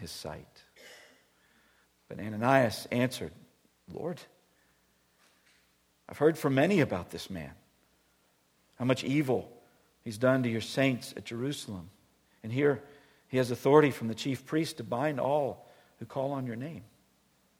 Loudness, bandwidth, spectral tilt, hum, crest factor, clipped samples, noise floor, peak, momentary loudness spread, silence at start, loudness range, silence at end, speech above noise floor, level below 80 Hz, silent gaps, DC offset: -30 LUFS; 17 kHz; -6 dB/octave; none; 24 dB; under 0.1%; -70 dBFS; -8 dBFS; 21 LU; 0 s; 5 LU; 0.75 s; 40 dB; -68 dBFS; none; under 0.1%